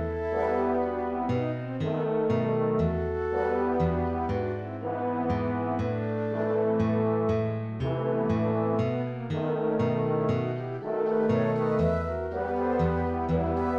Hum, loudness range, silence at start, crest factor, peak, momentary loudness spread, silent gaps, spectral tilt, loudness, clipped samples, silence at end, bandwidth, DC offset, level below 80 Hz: none; 1 LU; 0 s; 14 dB; -14 dBFS; 6 LU; none; -9.5 dB/octave; -28 LUFS; under 0.1%; 0 s; 7 kHz; under 0.1%; -44 dBFS